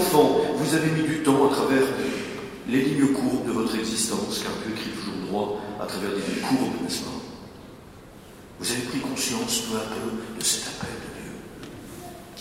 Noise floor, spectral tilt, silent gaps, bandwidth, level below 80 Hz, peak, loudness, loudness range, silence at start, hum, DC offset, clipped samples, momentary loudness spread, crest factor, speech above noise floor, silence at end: -45 dBFS; -4 dB/octave; none; 16 kHz; -54 dBFS; -4 dBFS; -25 LUFS; 6 LU; 0 s; none; under 0.1%; under 0.1%; 19 LU; 20 dB; 21 dB; 0 s